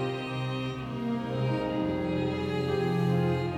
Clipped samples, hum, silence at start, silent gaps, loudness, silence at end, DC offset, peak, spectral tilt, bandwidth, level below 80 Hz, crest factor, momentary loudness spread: under 0.1%; none; 0 s; none; -30 LUFS; 0 s; under 0.1%; -16 dBFS; -8 dB/octave; 11 kHz; -52 dBFS; 14 dB; 6 LU